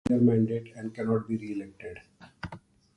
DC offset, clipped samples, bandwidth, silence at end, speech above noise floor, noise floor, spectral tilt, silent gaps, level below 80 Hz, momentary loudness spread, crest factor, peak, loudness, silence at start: under 0.1%; under 0.1%; 9.8 kHz; 0.4 s; 21 dB; -49 dBFS; -9 dB/octave; none; -58 dBFS; 20 LU; 18 dB; -12 dBFS; -29 LUFS; 0.05 s